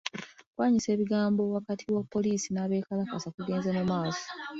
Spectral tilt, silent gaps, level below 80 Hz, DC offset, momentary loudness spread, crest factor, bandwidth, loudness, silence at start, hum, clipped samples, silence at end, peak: -5.5 dB/octave; 0.46-0.53 s, 3.34-3.38 s; -66 dBFS; under 0.1%; 9 LU; 20 dB; 7.8 kHz; -30 LUFS; 0.05 s; none; under 0.1%; 0 s; -10 dBFS